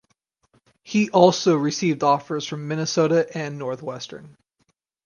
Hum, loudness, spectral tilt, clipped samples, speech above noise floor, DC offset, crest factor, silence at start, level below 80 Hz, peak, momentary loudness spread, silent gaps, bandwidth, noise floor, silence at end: none; -21 LUFS; -5 dB/octave; under 0.1%; 49 dB; under 0.1%; 22 dB; 0.85 s; -68 dBFS; 0 dBFS; 15 LU; none; 10 kHz; -70 dBFS; 0.8 s